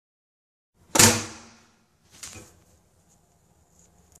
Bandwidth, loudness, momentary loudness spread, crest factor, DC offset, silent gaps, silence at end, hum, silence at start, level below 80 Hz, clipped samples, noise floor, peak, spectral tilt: 14 kHz; -18 LUFS; 25 LU; 28 dB; under 0.1%; none; 1.9 s; none; 0.95 s; -54 dBFS; under 0.1%; -62 dBFS; 0 dBFS; -2 dB/octave